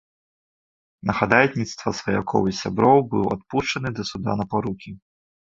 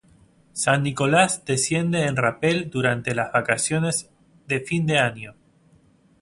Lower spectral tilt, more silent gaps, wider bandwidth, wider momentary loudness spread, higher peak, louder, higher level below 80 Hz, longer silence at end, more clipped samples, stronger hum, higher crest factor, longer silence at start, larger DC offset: first, -5.5 dB/octave vs -4 dB/octave; neither; second, 7.8 kHz vs 11.5 kHz; first, 11 LU vs 8 LU; about the same, -2 dBFS vs -2 dBFS; about the same, -22 LUFS vs -22 LUFS; first, -50 dBFS vs -58 dBFS; second, 0.5 s vs 0.9 s; neither; neither; about the same, 22 dB vs 22 dB; first, 1.05 s vs 0.55 s; neither